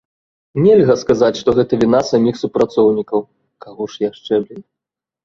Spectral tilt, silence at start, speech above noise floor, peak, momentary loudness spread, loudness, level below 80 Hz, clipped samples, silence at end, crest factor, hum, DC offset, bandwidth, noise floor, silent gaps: -7 dB/octave; 0.55 s; 70 dB; -2 dBFS; 11 LU; -15 LUFS; -50 dBFS; under 0.1%; 0.65 s; 14 dB; none; under 0.1%; 7.4 kHz; -85 dBFS; none